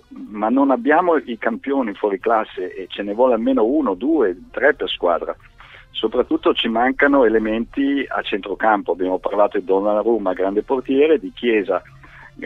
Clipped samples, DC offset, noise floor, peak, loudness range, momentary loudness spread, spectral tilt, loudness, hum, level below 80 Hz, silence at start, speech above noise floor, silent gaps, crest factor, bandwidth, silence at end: under 0.1%; under 0.1%; -39 dBFS; -2 dBFS; 1 LU; 9 LU; -7 dB/octave; -19 LUFS; none; -50 dBFS; 0.1 s; 21 dB; none; 16 dB; 4.4 kHz; 0 s